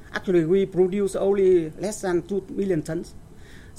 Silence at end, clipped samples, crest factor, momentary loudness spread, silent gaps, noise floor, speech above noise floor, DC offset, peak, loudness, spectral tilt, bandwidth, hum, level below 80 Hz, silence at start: 0 s; under 0.1%; 14 dB; 10 LU; none; -43 dBFS; 21 dB; under 0.1%; -10 dBFS; -23 LUFS; -6.5 dB/octave; 13.5 kHz; none; -48 dBFS; 0 s